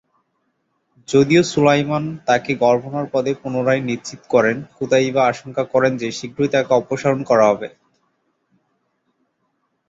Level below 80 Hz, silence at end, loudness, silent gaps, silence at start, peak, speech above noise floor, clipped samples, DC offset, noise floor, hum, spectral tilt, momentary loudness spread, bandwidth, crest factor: -58 dBFS; 2.2 s; -18 LUFS; none; 1.1 s; -2 dBFS; 52 dB; under 0.1%; under 0.1%; -69 dBFS; none; -5.5 dB/octave; 10 LU; 8 kHz; 18 dB